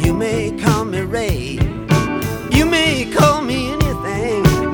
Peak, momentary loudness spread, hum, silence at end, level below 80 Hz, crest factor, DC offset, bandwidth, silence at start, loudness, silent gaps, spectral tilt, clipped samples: 0 dBFS; 7 LU; none; 0 s; -28 dBFS; 16 dB; under 0.1%; over 20 kHz; 0 s; -17 LUFS; none; -5.5 dB/octave; under 0.1%